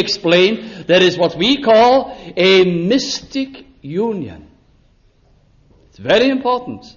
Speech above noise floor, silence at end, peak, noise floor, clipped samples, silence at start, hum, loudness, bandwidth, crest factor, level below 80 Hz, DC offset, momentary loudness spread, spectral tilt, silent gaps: 38 dB; 0.1 s; -2 dBFS; -53 dBFS; under 0.1%; 0 s; none; -14 LUFS; 7.2 kHz; 14 dB; -50 dBFS; under 0.1%; 15 LU; -5 dB/octave; none